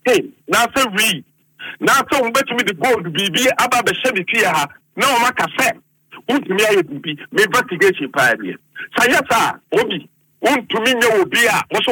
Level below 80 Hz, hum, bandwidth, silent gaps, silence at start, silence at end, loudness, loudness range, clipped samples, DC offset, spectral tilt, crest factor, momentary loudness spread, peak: -56 dBFS; none; 19 kHz; none; 0.05 s; 0 s; -16 LUFS; 1 LU; under 0.1%; under 0.1%; -2.5 dB/octave; 14 dB; 10 LU; -2 dBFS